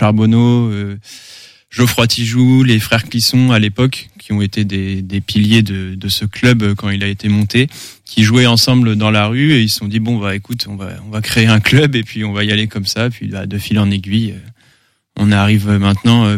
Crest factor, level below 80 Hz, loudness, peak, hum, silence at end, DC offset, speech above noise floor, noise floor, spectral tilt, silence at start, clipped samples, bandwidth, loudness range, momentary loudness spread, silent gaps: 14 dB; -44 dBFS; -13 LUFS; 0 dBFS; none; 0 s; under 0.1%; 42 dB; -55 dBFS; -5.5 dB/octave; 0 s; under 0.1%; 16 kHz; 3 LU; 12 LU; none